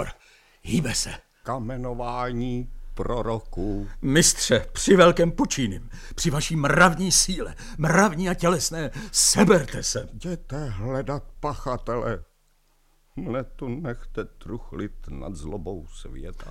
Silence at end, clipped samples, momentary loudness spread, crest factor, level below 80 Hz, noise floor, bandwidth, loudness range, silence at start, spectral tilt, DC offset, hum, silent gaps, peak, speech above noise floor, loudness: 0 s; under 0.1%; 19 LU; 22 dB; -36 dBFS; -63 dBFS; 16.5 kHz; 14 LU; 0 s; -4 dB/octave; under 0.1%; none; none; -2 dBFS; 39 dB; -23 LUFS